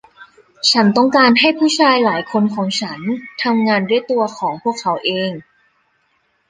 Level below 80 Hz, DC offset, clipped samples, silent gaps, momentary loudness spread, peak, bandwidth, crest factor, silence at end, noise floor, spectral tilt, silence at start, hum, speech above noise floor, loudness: -62 dBFS; under 0.1%; under 0.1%; none; 10 LU; 0 dBFS; 10 kHz; 16 dB; 1.1 s; -63 dBFS; -4 dB/octave; 0.2 s; none; 47 dB; -15 LUFS